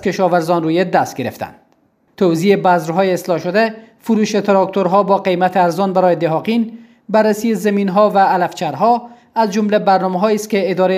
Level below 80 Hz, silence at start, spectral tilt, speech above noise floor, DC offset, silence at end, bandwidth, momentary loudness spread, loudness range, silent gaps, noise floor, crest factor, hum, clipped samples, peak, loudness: -62 dBFS; 0 s; -6 dB/octave; 43 dB; under 0.1%; 0 s; 16 kHz; 6 LU; 2 LU; none; -57 dBFS; 14 dB; none; under 0.1%; 0 dBFS; -15 LUFS